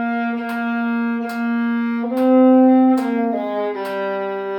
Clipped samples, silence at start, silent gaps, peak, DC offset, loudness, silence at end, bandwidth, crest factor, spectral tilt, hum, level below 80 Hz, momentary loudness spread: under 0.1%; 0 s; none; -4 dBFS; under 0.1%; -18 LUFS; 0 s; 13 kHz; 14 dB; -7 dB/octave; none; -64 dBFS; 11 LU